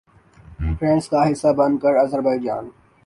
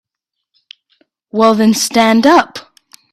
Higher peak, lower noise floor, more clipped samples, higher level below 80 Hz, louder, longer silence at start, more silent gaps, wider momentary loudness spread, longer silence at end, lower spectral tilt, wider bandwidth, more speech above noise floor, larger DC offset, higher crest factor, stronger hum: second, -6 dBFS vs 0 dBFS; second, -46 dBFS vs -78 dBFS; neither; first, -36 dBFS vs -56 dBFS; second, -19 LUFS vs -11 LUFS; second, 0.5 s vs 1.35 s; neither; second, 10 LU vs 15 LU; second, 0.35 s vs 0.55 s; first, -7.5 dB/octave vs -4 dB/octave; second, 11.5 kHz vs 15 kHz; second, 28 dB vs 68 dB; neither; about the same, 14 dB vs 14 dB; neither